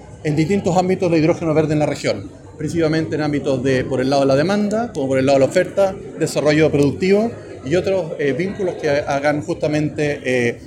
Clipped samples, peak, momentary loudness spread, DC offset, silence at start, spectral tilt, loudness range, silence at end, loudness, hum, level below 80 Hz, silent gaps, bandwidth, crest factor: under 0.1%; -4 dBFS; 7 LU; under 0.1%; 0 s; -6.5 dB/octave; 2 LU; 0 s; -18 LUFS; none; -48 dBFS; none; 14 kHz; 14 dB